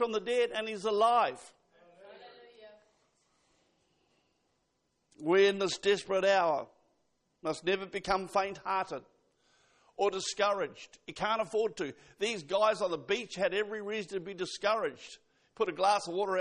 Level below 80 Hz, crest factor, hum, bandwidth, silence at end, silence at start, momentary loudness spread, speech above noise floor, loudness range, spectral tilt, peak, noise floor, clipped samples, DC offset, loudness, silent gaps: -68 dBFS; 18 dB; none; 10 kHz; 0 s; 0 s; 13 LU; 47 dB; 4 LU; -3.5 dB/octave; -14 dBFS; -78 dBFS; under 0.1%; under 0.1%; -32 LUFS; none